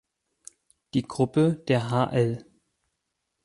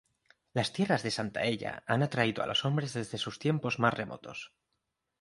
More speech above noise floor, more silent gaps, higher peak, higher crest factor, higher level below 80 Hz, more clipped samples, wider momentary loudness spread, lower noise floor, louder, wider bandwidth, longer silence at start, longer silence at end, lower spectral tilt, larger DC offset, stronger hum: first, 56 dB vs 51 dB; neither; about the same, -8 dBFS vs -10 dBFS; about the same, 18 dB vs 22 dB; about the same, -62 dBFS vs -66 dBFS; neither; second, 7 LU vs 11 LU; about the same, -80 dBFS vs -83 dBFS; first, -25 LUFS vs -31 LUFS; about the same, 11.5 kHz vs 11.5 kHz; first, 0.95 s vs 0.55 s; first, 1.05 s vs 0.75 s; first, -7 dB/octave vs -5.5 dB/octave; neither; neither